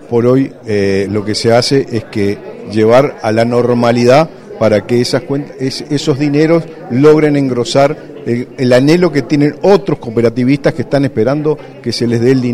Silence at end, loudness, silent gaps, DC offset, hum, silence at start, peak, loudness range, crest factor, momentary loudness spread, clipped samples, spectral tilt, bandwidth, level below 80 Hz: 0 s; -12 LUFS; none; under 0.1%; none; 0 s; 0 dBFS; 1 LU; 12 dB; 10 LU; 0.4%; -6.5 dB/octave; 14 kHz; -46 dBFS